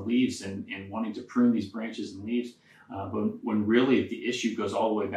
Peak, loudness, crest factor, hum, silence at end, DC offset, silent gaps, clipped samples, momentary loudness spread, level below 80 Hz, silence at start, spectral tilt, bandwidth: -8 dBFS; -29 LUFS; 20 dB; none; 0 s; under 0.1%; none; under 0.1%; 12 LU; -72 dBFS; 0 s; -5.5 dB/octave; 10.5 kHz